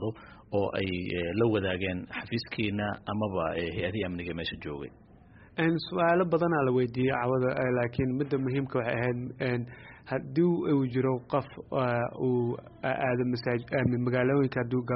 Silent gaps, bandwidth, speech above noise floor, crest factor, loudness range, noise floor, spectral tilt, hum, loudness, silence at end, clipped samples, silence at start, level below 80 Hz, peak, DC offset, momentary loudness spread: none; 5.4 kHz; 25 dB; 16 dB; 5 LU; -54 dBFS; -6 dB/octave; none; -29 LUFS; 0 s; under 0.1%; 0 s; -56 dBFS; -12 dBFS; under 0.1%; 9 LU